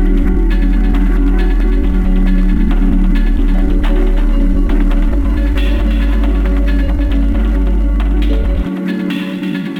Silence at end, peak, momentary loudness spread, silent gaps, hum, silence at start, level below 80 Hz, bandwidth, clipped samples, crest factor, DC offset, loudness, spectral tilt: 0 s; 0 dBFS; 3 LU; none; none; 0 s; -12 dBFS; 4.5 kHz; under 0.1%; 10 dB; under 0.1%; -15 LUFS; -8 dB/octave